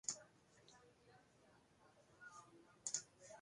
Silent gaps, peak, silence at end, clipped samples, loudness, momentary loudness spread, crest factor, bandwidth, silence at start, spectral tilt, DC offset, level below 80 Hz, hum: none; -26 dBFS; 0 s; under 0.1%; -50 LUFS; 23 LU; 30 dB; 11 kHz; 0.05 s; 0 dB/octave; under 0.1%; -88 dBFS; none